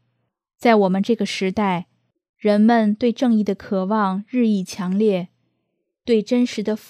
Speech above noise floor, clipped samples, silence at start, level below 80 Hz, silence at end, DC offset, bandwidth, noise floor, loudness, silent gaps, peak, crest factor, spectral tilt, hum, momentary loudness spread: 56 dB; under 0.1%; 0.6 s; -62 dBFS; 0.15 s; under 0.1%; 11 kHz; -74 dBFS; -20 LUFS; 2.29-2.34 s; -2 dBFS; 18 dB; -6.5 dB/octave; none; 8 LU